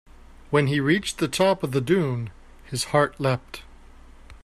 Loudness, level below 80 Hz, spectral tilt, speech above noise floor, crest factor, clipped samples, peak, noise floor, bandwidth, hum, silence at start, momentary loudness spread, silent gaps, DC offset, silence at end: -23 LUFS; -48 dBFS; -5.5 dB/octave; 24 dB; 18 dB; under 0.1%; -6 dBFS; -46 dBFS; 14 kHz; none; 0.5 s; 11 LU; none; under 0.1%; 0.05 s